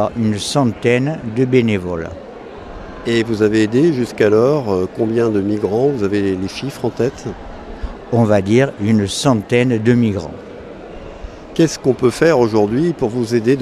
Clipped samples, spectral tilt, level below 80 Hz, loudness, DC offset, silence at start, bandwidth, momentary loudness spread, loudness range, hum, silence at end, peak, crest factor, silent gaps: under 0.1%; -6.5 dB/octave; -40 dBFS; -16 LUFS; under 0.1%; 0 s; 14 kHz; 19 LU; 3 LU; none; 0 s; 0 dBFS; 16 dB; none